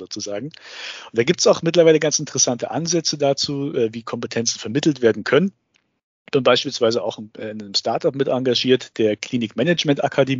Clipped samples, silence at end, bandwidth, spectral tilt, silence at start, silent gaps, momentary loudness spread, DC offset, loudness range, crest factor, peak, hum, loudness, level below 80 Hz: under 0.1%; 0 s; 7.6 kHz; -4 dB/octave; 0 s; 6.03-6.25 s; 13 LU; under 0.1%; 3 LU; 18 dB; -2 dBFS; none; -19 LUFS; -66 dBFS